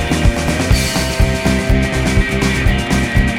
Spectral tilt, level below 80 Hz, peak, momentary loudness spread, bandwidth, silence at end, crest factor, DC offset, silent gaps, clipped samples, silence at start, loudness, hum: -5 dB/octave; -18 dBFS; 0 dBFS; 1 LU; 16.5 kHz; 0 s; 12 dB; under 0.1%; none; under 0.1%; 0 s; -15 LUFS; none